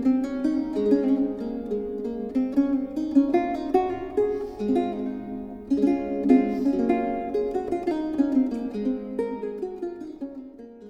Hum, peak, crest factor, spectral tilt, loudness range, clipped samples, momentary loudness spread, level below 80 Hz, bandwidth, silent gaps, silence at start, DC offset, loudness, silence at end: none; -6 dBFS; 20 dB; -8 dB/octave; 3 LU; under 0.1%; 12 LU; -52 dBFS; 7.2 kHz; none; 0 s; under 0.1%; -25 LUFS; 0 s